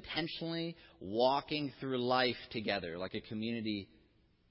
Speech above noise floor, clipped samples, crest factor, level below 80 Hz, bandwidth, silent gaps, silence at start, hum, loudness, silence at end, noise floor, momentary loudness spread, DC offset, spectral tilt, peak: 33 dB; under 0.1%; 20 dB; -66 dBFS; 5.8 kHz; none; 0 s; none; -36 LUFS; 0.65 s; -69 dBFS; 11 LU; under 0.1%; -8.5 dB/octave; -16 dBFS